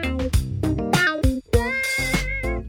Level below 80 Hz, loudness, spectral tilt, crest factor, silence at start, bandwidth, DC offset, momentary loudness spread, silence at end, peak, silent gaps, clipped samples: -28 dBFS; -22 LUFS; -5 dB/octave; 18 dB; 0 s; 20 kHz; under 0.1%; 5 LU; 0 s; -4 dBFS; none; under 0.1%